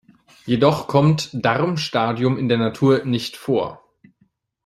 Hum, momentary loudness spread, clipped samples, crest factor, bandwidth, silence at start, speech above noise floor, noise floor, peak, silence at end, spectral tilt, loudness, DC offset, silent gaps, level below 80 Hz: none; 7 LU; under 0.1%; 18 dB; 13.5 kHz; 0.45 s; 45 dB; -64 dBFS; -2 dBFS; 0.9 s; -6.5 dB/octave; -20 LUFS; under 0.1%; none; -56 dBFS